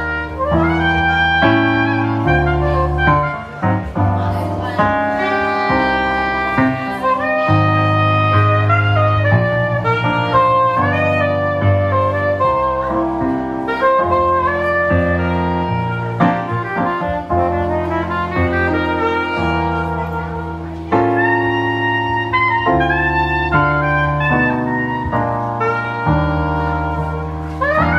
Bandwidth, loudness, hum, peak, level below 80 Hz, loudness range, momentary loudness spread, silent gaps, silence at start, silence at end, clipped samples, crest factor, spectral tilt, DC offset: 7.6 kHz; -16 LUFS; none; 0 dBFS; -32 dBFS; 3 LU; 6 LU; none; 0 s; 0 s; under 0.1%; 14 dB; -8 dB/octave; under 0.1%